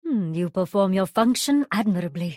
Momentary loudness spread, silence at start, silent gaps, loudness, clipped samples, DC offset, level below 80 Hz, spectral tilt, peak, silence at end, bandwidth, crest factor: 5 LU; 0.05 s; none; -23 LUFS; under 0.1%; under 0.1%; -64 dBFS; -5.5 dB/octave; -6 dBFS; 0 s; 16.5 kHz; 16 dB